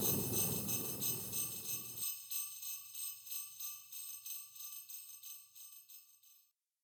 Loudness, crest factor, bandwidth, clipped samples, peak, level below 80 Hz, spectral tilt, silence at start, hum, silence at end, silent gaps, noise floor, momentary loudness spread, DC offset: -40 LUFS; 20 dB; over 20 kHz; under 0.1%; -22 dBFS; -72 dBFS; -2.5 dB/octave; 0 s; none; 0.45 s; none; -73 dBFS; 17 LU; under 0.1%